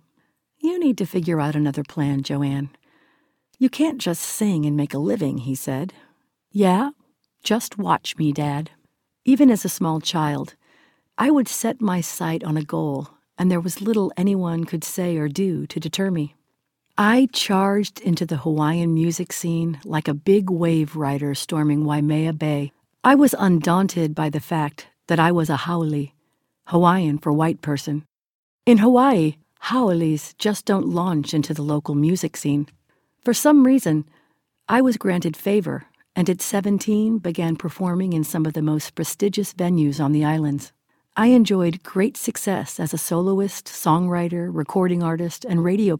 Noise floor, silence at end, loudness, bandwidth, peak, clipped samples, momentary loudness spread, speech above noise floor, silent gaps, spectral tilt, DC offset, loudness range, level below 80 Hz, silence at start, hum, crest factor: -73 dBFS; 0 s; -21 LUFS; 19 kHz; -2 dBFS; under 0.1%; 10 LU; 53 dB; 28.26-28.59 s; -6 dB/octave; under 0.1%; 4 LU; -62 dBFS; 0.65 s; none; 20 dB